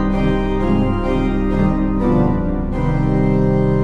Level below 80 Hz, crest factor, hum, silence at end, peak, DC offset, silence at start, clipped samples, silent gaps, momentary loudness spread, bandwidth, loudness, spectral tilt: -22 dBFS; 12 dB; none; 0 s; -4 dBFS; under 0.1%; 0 s; under 0.1%; none; 4 LU; 6.6 kHz; -17 LUFS; -9.5 dB/octave